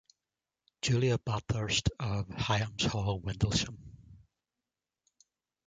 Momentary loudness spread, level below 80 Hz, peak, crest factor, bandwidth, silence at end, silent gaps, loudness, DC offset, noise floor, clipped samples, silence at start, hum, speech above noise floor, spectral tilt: 6 LU; -50 dBFS; -14 dBFS; 20 dB; 9.4 kHz; 1.5 s; none; -32 LUFS; under 0.1%; under -90 dBFS; under 0.1%; 0.85 s; none; over 59 dB; -4.5 dB/octave